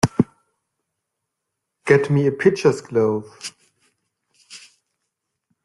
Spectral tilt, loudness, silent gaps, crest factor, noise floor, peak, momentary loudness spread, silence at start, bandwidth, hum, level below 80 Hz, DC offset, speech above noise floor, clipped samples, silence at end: -6.5 dB/octave; -19 LUFS; none; 22 dB; -80 dBFS; 0 dBFS; 22 LU; 0.05 s; 12 kHz; none; -56 dBFS; under 0.1%; 62 dB; under 0.1%; 1.05 s